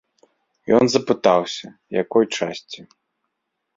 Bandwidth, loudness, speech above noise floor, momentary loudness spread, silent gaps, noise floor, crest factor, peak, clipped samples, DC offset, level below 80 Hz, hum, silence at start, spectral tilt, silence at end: 7.8 kHz; -20 LUFS; 58 dB; 20 LU; none; -77 dBFS; 20 dB; -2 dBFS; under 0.1%; under 0.1%; -62 dBFS; none; 0.65 s; -4.5 dB/octave; 0.95 s